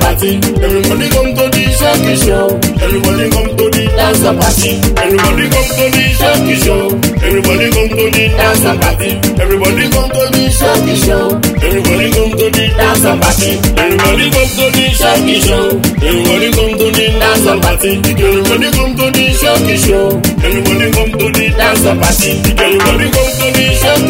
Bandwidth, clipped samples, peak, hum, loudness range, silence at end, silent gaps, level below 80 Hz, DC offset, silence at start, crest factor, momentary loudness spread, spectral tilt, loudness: 16.5 kHz; 0.2%; 0 dBFS; none; 1 LU; 0 s; none; -18 dBFS; under 0.1%; 0 s; 10 dB; 3 LU; -4 dB/octave; -9 LUFS